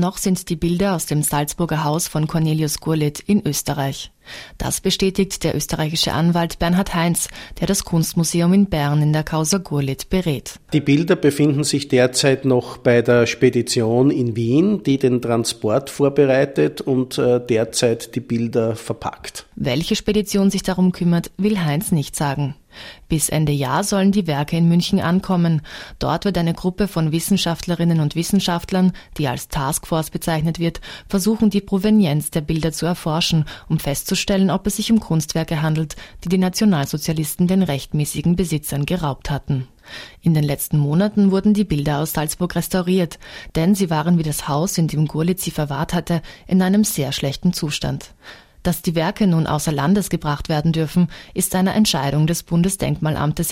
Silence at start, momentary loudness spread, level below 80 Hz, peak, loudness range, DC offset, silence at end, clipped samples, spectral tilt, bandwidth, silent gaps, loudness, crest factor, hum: 0 s; 7 LU; -40 dBFS; -2 dBFS; 4 LU; under 0.1%; 0 s; under 0.1%; -5.5 dB/octave; 16 kHz; none; -19 LUFS; 18 dB; none